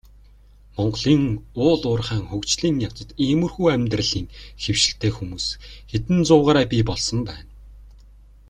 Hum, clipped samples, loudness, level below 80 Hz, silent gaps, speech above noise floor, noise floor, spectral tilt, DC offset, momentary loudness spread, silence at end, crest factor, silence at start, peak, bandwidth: 50 Hz at -40 dBFS; under 0.1%; -21 LUFS; -42 dBFS; none; 28 dB; -49 dBFS; -5 dB/octave; under 0.1%; 12 LU; 0.55 s; 20 dB; 0.75 s; -2 dBFS; 11 kHz